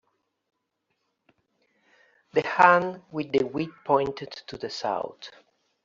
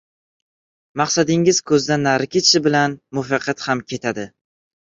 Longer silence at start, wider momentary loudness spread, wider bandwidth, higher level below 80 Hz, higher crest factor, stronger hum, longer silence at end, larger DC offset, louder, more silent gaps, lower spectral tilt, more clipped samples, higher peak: first, 2.35 s vs 0.95 s; first, 19 LU vs 12 LU; about the same, 7.6 kHz vs 8 kHz; second, -66 dBFS vs -60 dBFS; first, 26 dB vs 18 dB; neither; about the same, 0.55 s vs 0.65 s; neither; second, -25 LUFS vs -18 LUFS; neither; about the same, -3 dB/octave vs -3.5 dB/octave; neither; about the same, -2 dBFS vs -2 dBFS